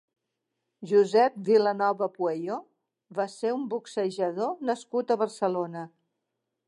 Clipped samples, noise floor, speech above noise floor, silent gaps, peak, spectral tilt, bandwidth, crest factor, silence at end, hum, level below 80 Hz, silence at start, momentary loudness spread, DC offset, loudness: under 0.1%; -83 dBFS; 56 dB; none; -10 dBFS; -6 dB/octave; 11 kHz; 18 dB; 0.8 s; none; -86 dBFS; 0.8 s; 13 LU; under 0.1%; -27 LUFS